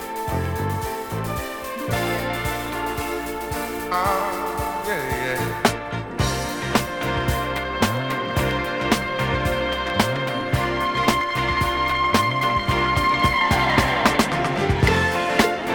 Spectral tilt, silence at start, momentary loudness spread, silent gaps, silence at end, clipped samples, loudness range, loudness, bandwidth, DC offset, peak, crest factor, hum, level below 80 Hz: -4.5 dB/octave; 0 s; 9 LU; none; 0 s; under 0.1%; 6 LU; -22 LUFS; over 20 kHz; under 0.1%; -2 dBFS; 20 dB; none; -36 dBFS